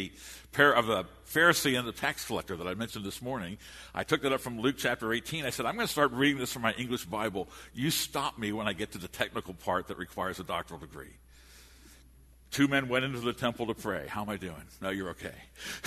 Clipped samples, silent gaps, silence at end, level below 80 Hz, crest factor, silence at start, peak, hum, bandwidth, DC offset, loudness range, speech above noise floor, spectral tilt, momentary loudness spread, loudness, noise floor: under 0.1%; none; 0 s; -58 dBFS; 26 dB; 0 s; -8 dBFS; none; 13.5 kHz; under 0.1%; 7 LU; 25 dB; -4 dB/octave; 15 LU; -31 LUFS; -57 dBFS